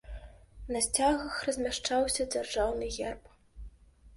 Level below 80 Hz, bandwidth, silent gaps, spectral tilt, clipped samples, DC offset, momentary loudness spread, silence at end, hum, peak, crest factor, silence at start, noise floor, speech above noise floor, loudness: -48 dBFS; 12 kHz; none; -2.5 dB/octave; under 0.1%; under 0.1%; 20 LU; 0 s; none; -12 dBFS; 20 dB; 0.05 s; -54 dBFS; 23 dB; -31 LUFS